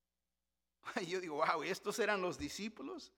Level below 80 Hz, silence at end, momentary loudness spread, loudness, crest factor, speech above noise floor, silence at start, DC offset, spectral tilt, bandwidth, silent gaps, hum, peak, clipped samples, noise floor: -70 dBFS; 0.1 s; 10 LU; -39 LUFS; 20 dB; over 51 dB; 0.85 s; under 0.1%; -3.5 dB/octave; 17.5 kHz; none; none; -20 dBFS; under 0.1%; under -90 dBFS